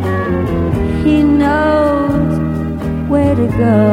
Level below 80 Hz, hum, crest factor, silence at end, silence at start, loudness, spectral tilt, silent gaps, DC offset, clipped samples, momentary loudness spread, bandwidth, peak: -26 dBFS; none; 12 dB; 0 s; 0 s; -14 LUFS; -8.5 dB/octave; none; under 0.1%; under 0.1%; 6 LU; 12 kHz; 0 dBFS